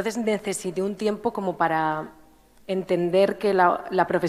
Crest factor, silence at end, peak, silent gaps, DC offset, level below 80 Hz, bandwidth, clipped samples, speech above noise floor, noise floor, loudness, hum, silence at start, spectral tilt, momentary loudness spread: 18 dB; 0 s; -6 dBFS; none; under 0.1%; -60 dBFS; 15 kHz; under 0.1%; 30 dB; -53 dBFS; -24 LUFS; none; 0 s; -5.5 dB/octave; 9 LU